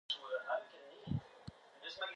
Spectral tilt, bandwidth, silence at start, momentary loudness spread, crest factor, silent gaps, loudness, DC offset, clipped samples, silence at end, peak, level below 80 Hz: -5.5 dB/octave; 10.5 kHz; 0.1 s; 16 LU; 18 dB; none; -43 LUFS; under 0.1%; under 0.1%; 0 s; -26 dBFS; -64 dBFS